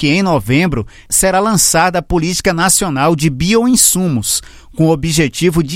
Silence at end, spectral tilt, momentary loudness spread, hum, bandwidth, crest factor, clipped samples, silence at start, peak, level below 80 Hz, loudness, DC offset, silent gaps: 0 s; -4 dB/octave; 6 LU; none; 16.5 kHz; 12 dB; under 0.1%; 0 s; 0 dBFS; -32 dBFS; -12 LUFS; under 0.1%; none